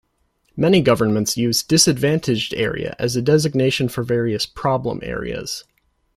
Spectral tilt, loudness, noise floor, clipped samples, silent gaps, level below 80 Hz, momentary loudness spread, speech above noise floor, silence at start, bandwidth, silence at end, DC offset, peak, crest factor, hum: -4.5 dB/octave; -19 LUFS; -65 dBFS; under 0.1%; none; -46 dBFS; 11 LU; 47 dB; 0.55 s; 16 kHz; 0.55 s; under 0.1%; -2 dBFS; 18 dB; none